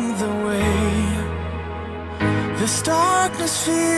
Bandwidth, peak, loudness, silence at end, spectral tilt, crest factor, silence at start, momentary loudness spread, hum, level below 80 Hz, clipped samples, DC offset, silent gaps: 12 kHz; -6 dBFS; -21 LUFS; 0 s; -4.5 dB/octave; 14 dB; 0 s; 11 LU; none; -38 dBFS; under 0.1%; under 0.1%; none